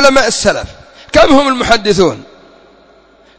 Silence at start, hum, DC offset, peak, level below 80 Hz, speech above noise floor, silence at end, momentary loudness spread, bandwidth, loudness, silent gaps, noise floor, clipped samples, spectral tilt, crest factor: 0 s; none; under 0.1%; 0 dBFS; -34 dBFS; 35 dB; 0 s; 13 LU; 8 kHz; -10 LUFS; none; -45 dBFS; 1%; -3.5 dB/octave; 12 dB